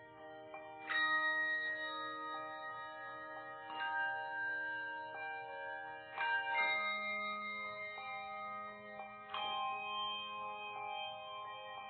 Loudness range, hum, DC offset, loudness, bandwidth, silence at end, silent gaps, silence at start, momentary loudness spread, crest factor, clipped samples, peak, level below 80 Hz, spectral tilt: 4 LU; none; under 0.1%; -40 LUFS; 4.5 kHz; 0 s; none; 0 s; 13 LU; 18 dB; under 0.1%; -24 dBFS; -84 dBFS; 1.5 dB/octave